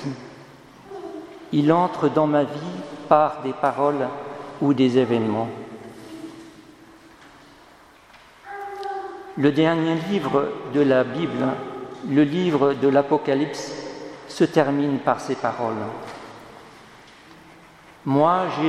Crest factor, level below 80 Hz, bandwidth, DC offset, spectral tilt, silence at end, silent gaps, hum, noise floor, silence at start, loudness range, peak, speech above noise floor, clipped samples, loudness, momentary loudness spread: 22 dB; -64 dBFS; 11 kHz; under 0.1%; -7 dB/octave; 0 s; none; none; -50 dBFS; 0 s; 9 LU; -2 dBFS; 29 dB; under 0.1%; -22 LUFS; 20 LU